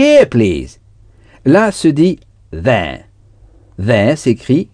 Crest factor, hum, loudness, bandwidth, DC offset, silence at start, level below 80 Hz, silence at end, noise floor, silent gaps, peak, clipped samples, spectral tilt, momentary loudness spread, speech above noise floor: 14 dB; none; -13 LUFS; 10 kHz; under 0.1%; 0 s; -38 dBFS; 0.1 s; -44 dBFS; none; 0 dBFS; 0.2%; -6.5 dB/octave; 16 LU; 33 dB